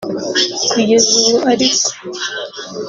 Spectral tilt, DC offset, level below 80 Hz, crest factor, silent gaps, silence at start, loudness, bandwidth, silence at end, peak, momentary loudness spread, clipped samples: -1.5 dB/octave; under 0.1%; -56 dBFS; 16 dB; none; 0 s; -13 LUFS; 7.8 kHz; 0 s; 0 dBFS; 13 LU; under 0.1%